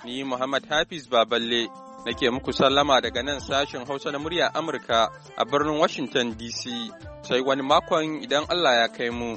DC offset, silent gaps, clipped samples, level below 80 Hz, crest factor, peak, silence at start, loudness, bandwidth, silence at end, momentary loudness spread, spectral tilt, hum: under 0.1%; none; under 0.1%; -52 dBFS; 20 dB; -6 dBFS; 0 s; -24 LUFS; 8.4 kHz; 0 s; 10 LU; -3.5 dB/octave; none